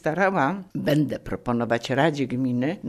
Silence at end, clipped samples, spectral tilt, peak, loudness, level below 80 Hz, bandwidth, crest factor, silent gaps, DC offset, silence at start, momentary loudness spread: 0 s; under 0.1%; -6.5 dB/octave; -6 dBFS; -24 LUFS; -52 dBFS; 13.5 kHz; 16 dB; none; under 0.1%; 0.05 s; 6 LU